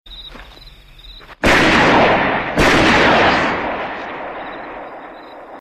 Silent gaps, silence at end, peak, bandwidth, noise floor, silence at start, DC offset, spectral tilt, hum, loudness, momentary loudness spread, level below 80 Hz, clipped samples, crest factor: none; 0 s; 0 dBFS; 15.5 kHz; -40 dBFS; 0.05 s; under 0.1%; -4.5 dB/octave; none; -13 LUFS; 23 LU; -34 dBFS; under 0.1%; 16 dB